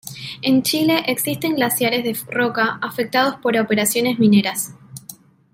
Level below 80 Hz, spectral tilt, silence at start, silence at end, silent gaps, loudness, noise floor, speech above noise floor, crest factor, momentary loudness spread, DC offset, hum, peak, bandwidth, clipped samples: -62 dBFS; -4 dB/octave; 0.05 s; 0.4 s; none; -18 LUFS; -43 dBFS; 25 dB; 16 dB; 11 LU; under 0.1%; none; -4 dBFS; 16.5 kHz; under 0.1%